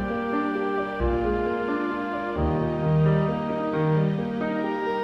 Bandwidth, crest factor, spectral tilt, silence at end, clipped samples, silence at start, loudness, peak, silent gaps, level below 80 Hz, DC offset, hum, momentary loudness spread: 6 kHz; 12 dB; -9.5 dB/octave; 0 s; under 0.1%; 0 s; -25 LUFS; -12 dBFS; none; -38 dBFS; under 0.1%; none; 5 LU